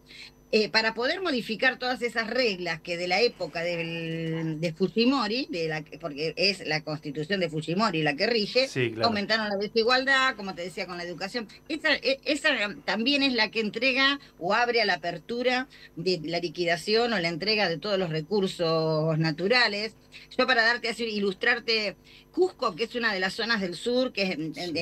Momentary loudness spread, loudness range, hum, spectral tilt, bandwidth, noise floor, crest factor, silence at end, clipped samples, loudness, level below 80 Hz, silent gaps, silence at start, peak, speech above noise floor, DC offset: 10 LU; 3 LU; none; -4.5 dB/octave; 14 kHz; -49 dBFS; 18 dB; 0 s; under 0.1%; -26 LUFS; -62 dBFS; none; 0.1 s; -8 dBFS; 22 dB; under 0.1%